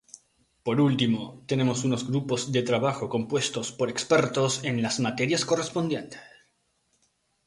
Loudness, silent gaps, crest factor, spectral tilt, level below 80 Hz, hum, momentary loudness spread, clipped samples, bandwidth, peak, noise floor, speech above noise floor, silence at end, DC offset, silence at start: -26 LUFS; none; 18 dB; -5 dB/octave; -64 dBFS; none; 7 LU; under 0.1%; 11.5 kHz; -8 dBFS; -71 dBFS; 45 dB; 1.2 s; under 0.1%; 0.65 s